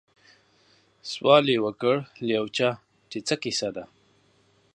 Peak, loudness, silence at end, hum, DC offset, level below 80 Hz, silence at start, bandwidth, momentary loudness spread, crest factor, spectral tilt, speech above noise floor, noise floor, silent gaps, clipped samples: -4 dBFS; -25 LUFS; 0.9 s; none; under 0.1%; -70 dBFS; 1.05 s; 10.5 kHz; 19 LU; 24 dB; -4.5 dB/octave; 39 dB; -63 dBFS; none; under 0.1%